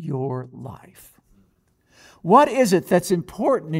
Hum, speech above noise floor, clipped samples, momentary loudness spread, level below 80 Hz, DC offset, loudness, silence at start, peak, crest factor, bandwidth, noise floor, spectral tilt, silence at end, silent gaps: none; 43 dB; under 0.1%; 21 LU; -58 dBFS; under 0.1%; -19 LUFS; 0 s; -2 dBFS; 20 dB; 16 kHz; -63 dBFS; -6 dB/octave; 0 s; none